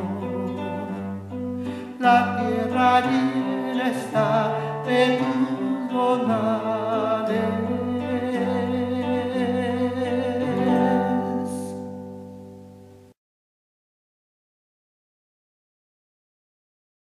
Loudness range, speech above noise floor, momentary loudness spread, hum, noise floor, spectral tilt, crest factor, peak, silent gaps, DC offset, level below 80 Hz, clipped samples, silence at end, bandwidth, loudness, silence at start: 5 LU; 26 dB; 12 LU; none; -47 dBFS; -6.5 dB/octave; 20 dB; -4 dBFS; none; under 0.1%; -70 dBFS; under 0.1%; 4.15 s; 12.5 kHz; -23 LUFS; 0 s